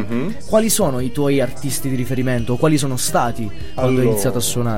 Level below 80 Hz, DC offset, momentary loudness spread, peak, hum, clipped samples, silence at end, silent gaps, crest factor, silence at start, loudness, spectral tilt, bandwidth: -38 dBFS; 7%; 7 LU; -2 dBFS; none; under 0.1%; 0 s; none; 16 dB; 0 s; -19 LUFS; -5 dB/octave; 16.5 kHz